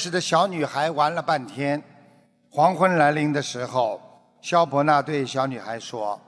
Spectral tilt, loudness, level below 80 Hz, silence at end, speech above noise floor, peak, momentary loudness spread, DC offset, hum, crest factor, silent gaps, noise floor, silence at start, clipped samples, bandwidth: -5 dB/octave; -23 LUFS; -70 dBFS; 0.1 s; 34 dB; -4 dBFS; 11 LU; under 0.1%; none; 18 dB; none; -57 dBFS; 0 s; under 0.1%; 11 kHz